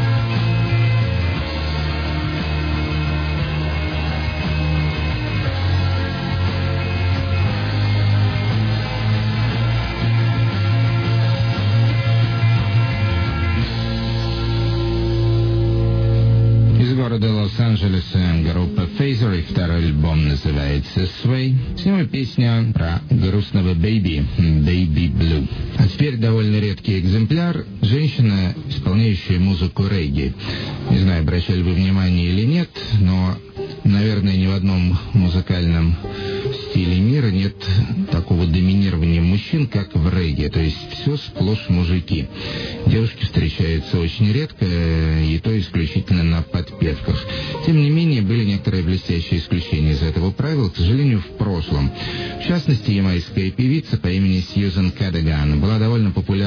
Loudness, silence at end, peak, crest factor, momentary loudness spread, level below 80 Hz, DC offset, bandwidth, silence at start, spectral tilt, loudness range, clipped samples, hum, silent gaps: -19 LUFS; 0 s; -4 dBFS; 14 dB; 5 LU; -30 dBFS; under 0.1%; 5.4 kHz; 0 s; -8.5 dB/octave; 3 LU; under 0.1%; none; none